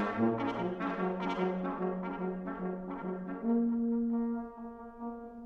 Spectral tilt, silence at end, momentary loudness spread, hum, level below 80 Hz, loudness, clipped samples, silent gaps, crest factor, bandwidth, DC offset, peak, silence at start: -9 dB/octave; 0 s; 12 LU; none; -62 dBFS; -35 LUFS; under 0.1%; none; 16 dB; 6.2 kHz; under 0.1%; -18 dBFS; 0 s